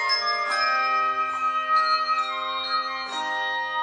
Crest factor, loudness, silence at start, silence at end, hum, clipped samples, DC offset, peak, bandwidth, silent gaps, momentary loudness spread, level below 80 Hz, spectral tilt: 12 dB; -23 LUFS; 0 s; 0 s; none; under 0.1%; under 0.1%; -12 dBFS; 10 kHz; none; 6 LU; -74 dBFS; 0 dB/octave